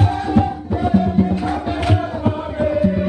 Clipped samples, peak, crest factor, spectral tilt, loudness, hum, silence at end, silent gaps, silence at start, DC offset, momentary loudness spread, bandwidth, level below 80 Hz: under 0.1%; 0 dBFS; 16 dB; -8.5 dB/octave; -18 LUFS; none; 0 s; none; 0 s; under 0.1%; 6 LU; 9.4 kHz; -32 dBFS